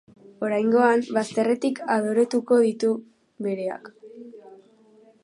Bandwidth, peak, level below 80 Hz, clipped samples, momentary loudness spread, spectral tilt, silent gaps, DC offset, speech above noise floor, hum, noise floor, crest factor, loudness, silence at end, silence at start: 11.5 kHz; -6 dBFS; -78 dBFS; under 0.1%; 20 LU; -5.5 dB/octave; none; under 0.1%; 33 dB; none; -55 dBFS; 18 dB; -23 LUFS; 0.7 s; 0.4 s